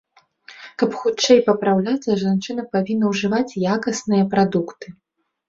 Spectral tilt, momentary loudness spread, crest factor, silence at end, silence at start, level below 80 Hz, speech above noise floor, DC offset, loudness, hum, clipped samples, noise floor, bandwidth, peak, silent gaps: -5.5 dB/octave; 13 LU; 18 dB; 0.55 s; 0.5 s; -60 dBFS; 29 dB; under 0.1%; -19 LUFS; none; under 0.1%; -48 dBFS; 7.8 kHz; -2 dBFS; none